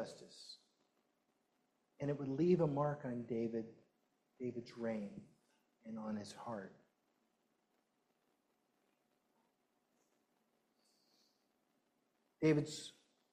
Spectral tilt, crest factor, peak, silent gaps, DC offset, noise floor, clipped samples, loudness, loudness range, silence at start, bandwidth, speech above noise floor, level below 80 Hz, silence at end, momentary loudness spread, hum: -7 dB/octave; 22 dB; -22 dBFS; none; under 0.1%; -82 dBFS; under 0.1%; -41 LUFS; 12 LU; 0 s; 12 kHz; 42 dB; -82 dBFS; 0.45 s; 20 LU; none